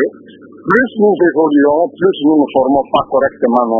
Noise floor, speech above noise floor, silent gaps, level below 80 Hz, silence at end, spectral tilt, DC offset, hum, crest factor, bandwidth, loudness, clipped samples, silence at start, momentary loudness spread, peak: -37 dBFS; 26 dB; none; -50 dBFS; 0 s; -8.5 dB/octave; under 0.1%; none; 12 dB; 3.7 kHz; -12 LUFS; under 0.1%; 0 s; 3 LU; 0 dBFS